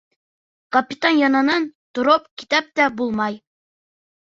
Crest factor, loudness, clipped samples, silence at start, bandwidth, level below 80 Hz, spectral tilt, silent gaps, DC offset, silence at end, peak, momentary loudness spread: 18 dB; -19 LUFS; under 0.1%; 0.7 s; 7.6 kHz; -64 dBFS; -4 dB/octave; 1.75-1.94 s, 2.31-2.37 s; under 0.1%; 0.85 s; -2 dBFS; 8 LU